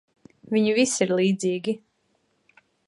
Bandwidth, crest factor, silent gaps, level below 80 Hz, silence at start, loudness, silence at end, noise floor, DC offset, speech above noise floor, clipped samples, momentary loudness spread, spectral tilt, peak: 11.5 kHz; 20 dB; none; -72 dBFS; 0.5 s; -23 LUFS; 1.1 s; -70 dBFS; under 0.1%; 47 dB; under 0.1%; 9 LU; -4.5 dB/octave; -6 dBFS